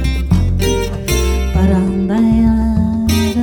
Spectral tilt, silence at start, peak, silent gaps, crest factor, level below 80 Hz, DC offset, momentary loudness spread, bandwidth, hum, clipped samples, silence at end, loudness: -6 dB/octave; 0 s; 0 dBFS; none; 12 dB; -20 dBFS; under 0.1%; 4 LU; over 20 kHz; none; under 0.1%; 0 s; -14 LUFS